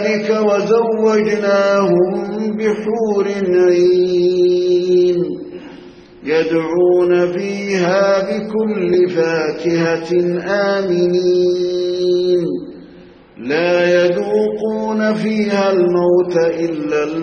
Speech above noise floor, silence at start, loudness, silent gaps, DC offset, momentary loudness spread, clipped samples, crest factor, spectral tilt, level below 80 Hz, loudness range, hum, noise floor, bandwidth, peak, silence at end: 26 dB; 0 s; -15 LUFS; none; under 0.1%; 6 LU; under 0.1%; 12 dB; -6.5 dB/octave; -56 dBFS; 2 LU; none; -41 dBFS; 7 kHz; -2 dBFS; 0 s